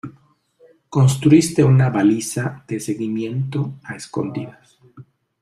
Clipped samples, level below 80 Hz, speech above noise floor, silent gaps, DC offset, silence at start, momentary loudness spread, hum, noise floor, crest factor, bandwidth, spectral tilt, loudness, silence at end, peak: under 0.1%; -54 dBFS; 38 dB; none; under 0.1%; 0.05 s; 15 LU; none; -55 dBFS; 18 dB; 14.5 kHz; -6.5 dB/octave; -18 LUFS; 0.4 s; -2 dBFS